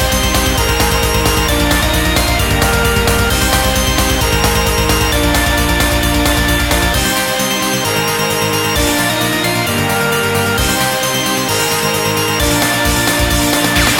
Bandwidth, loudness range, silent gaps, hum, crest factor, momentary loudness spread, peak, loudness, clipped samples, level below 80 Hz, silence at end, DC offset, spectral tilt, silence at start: 17 kHz; 1 LU; none; none; 14 dB; 2 LU; 0 dBFS; -13 LUFS; under 0.1%; -22 dBFS; 0 s; 0.2%; -3.5 dB/octave; 0 s